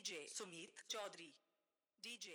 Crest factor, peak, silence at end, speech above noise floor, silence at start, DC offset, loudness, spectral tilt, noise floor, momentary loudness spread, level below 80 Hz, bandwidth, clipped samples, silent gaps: 20 dB; -34 dBFS; 0 s; over 37 dB; 0 s; under 0.1%; -51 LUFS; -0.5 dB/octave; under -90 dBFS; 10 LU; under -90 dBFS; over 20 kHz; under 0.1%; none